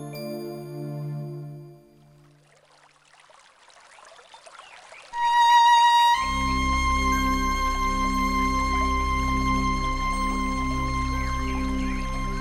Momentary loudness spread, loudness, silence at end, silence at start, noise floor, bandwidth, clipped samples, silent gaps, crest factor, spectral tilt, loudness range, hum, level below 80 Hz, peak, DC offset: 18 LU; -23 LUFS; 0 s; 0 s; -57 dBFS; 16 kHz; under 0.1%; none; 16 dB; -4 dB/octave; 18 LU; none; -32 dBFS; -10 dBFS; under 0.1%